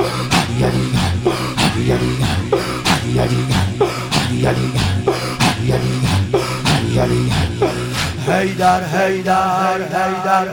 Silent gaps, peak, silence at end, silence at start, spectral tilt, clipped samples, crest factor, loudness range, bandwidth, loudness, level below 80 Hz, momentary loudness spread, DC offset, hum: none; 0 dBFS; 0 s; 0 s; -5 dB/octave; under 0.1%; 16 dB; 1 LU; 17.5 kHz; -17 LUFS; -34 dBFS; 3 LU; under 0.1%; none